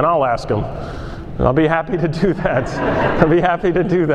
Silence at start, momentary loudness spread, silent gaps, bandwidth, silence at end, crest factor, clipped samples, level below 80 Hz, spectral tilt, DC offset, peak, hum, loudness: 0 s; 13 LU; none; 9.4 kHz; 0 s; 16 dB; under 0.1%; -32 dBFS; -8 dB/octave; under 0.1%; 0 dBFS; none; -17 LUFS